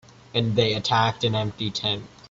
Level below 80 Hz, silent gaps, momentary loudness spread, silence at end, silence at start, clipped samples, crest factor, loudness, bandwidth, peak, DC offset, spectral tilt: -54 dBFS; none; 7 LU; 0.25 s; 0.35 s; under 0.1%; 16 dB; -24 LUFS; 7.8 kHz; -8 dBFS; under 0.1%; -5 dB/octave